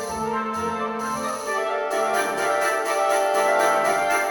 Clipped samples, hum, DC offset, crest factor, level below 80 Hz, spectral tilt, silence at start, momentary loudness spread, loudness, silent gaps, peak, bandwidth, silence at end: under 0.1%; none; under 0.1%; 14 dB; -58 dBFS; -2.5 dB/octave; 0 s; 7 LU; -22 LUFS; none; -8 dBFS; over 20 kHz; 0 s